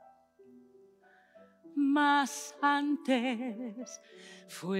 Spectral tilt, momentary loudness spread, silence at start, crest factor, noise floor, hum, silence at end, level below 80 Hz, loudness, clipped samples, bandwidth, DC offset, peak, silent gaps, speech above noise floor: -4 dB/octave; 20 LU; 0.55 s; 18 dB; -63 dBFS; none; 0 s; under -90 dBFS; -31 LUFS; under 0.1%; 15.5 kHz; under 0.1%; -16 dBFS; none; 32 dB